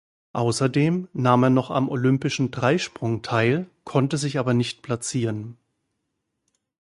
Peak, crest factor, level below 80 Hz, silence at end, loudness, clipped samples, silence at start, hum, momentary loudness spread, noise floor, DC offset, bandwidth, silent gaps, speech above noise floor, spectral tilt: -2 dBFS; 20 dB; -60 dBFS; 1.45 s; -23 LUFS; under 0.1%; 0.35 s; none; 8 LU; -78 dBFS; under 0.1%; 11.5 kHz; none; 56 dB; -6 dB/octave